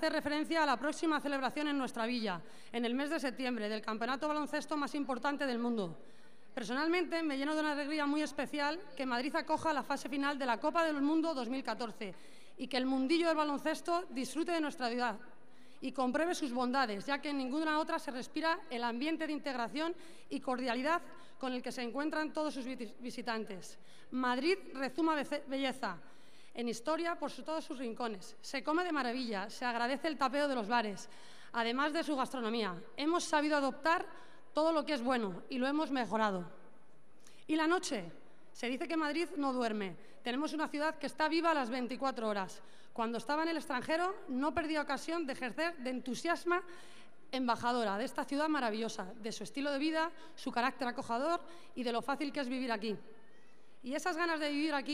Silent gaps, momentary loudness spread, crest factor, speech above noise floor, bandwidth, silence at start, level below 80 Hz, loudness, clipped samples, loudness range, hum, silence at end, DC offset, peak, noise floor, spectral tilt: none; 10 LU; 18 dB; 30 dB; 15 kHz; 0 s; -78 dBFS; -36 LUFS; under 0.1%; 3 LU; none; 0 s; 0.4%; -18 dBFS; -66 dBFS; -4 dB/octave